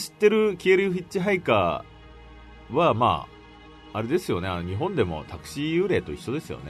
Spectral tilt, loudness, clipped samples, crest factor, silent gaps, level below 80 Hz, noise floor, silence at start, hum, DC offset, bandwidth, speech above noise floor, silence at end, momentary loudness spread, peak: -6 dB/octave; -25 LUFS; under 0.1%; 18 dB; none; -50 dBFS; -47 dBFS; 0 s; none; under 0.1%; 13.5 kHz; 23 dB; 0 s; 12 LU; -6 dBFS